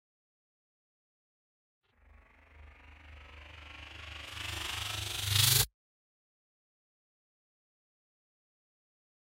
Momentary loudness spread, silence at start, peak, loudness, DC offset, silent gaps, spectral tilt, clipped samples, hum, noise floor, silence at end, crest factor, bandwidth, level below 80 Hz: 26 LU; 2.55 s; -12 dBFS; -30 LUFS; under 0.1%; none; -1.5 dB/octave; under 0.1%; none; -62 dBFS; 3.7 s; 26 dB; 16 kHz; -56 dBFS